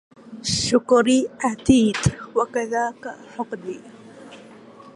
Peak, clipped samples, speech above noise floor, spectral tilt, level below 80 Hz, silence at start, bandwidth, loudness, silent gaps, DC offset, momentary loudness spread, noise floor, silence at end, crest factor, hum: -4 dBFS; under 0.1%; 24 dB; -4.5 dB/octave; -46 dBFS; 0.25 s; 11.5 kHz; -21 LUFS; none; under 0.1%; 18 LU; -44 dBFS; 0.05 s; 20 dB; none